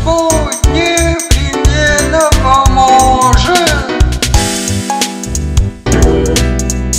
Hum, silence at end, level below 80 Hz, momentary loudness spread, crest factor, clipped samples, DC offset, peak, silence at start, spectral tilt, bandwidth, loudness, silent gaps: none; 0 s; -14 dBFS; 7 LU; 10 dB; 0.5%; 0.4%; 0 dBFS; 0 s; -4 dB/octave; 16.5 kHz; -10 LUFS; none